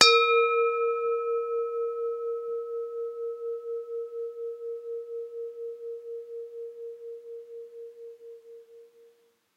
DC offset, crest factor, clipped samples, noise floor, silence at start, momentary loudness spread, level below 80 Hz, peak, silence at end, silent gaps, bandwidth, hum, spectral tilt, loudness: under 0.1%; 30 dB; under 0.1%; -64 dBFS; 0 s; 20 LU; under -90 dBFS; 0 dBFS; 0.7 s; none; 10.5 kHz; none; 0.5 dB/octave; -30 LUFS